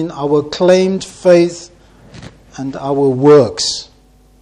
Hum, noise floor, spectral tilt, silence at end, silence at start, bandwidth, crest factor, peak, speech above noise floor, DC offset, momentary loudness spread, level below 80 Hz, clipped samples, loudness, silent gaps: none; -47 dBFS; -5.5 dB/octave; 0.6 s; 0 s; 10.5 kHz; 14 dB; 0 dBFS; 35 dB; under 0.1%; 17 LU; -48 dBFS; 0.1%; -13 LUFS; none